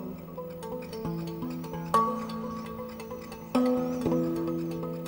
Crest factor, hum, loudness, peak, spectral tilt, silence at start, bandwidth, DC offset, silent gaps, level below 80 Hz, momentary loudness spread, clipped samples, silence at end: 20 dB; none; -32 LUFS; -10 dBFS; -7 dB/octave; 0 s; 16.5 kHz; under 0.1%; none; -56 dBFS; 13 LU; under 0.1%; 0 s